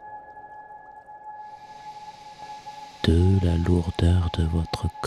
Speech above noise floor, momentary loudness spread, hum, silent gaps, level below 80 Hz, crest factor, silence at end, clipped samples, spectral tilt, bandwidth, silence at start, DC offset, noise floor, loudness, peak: 23 dB; 22 LU; none; none; -40 dBFS; 18 dB; 0 s; under 0.1%; -7.5 dB/octave; 11 kHz; 0 s; under 0.1%; -44 dBFS; -23 LUFS; -6 dBFS